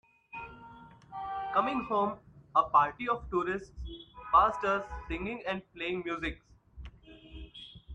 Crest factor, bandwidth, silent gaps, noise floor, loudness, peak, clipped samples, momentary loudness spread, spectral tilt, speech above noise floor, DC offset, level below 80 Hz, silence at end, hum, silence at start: 20 dB; 8.8 kHz; none; -53 dBFS; -31 LUFS; -12 dBFS; under 0.1%; 25 LU; -6 dB/octave; 22 dB; under 0.1%; -52 dBFS; 0 s; none; 0.35 s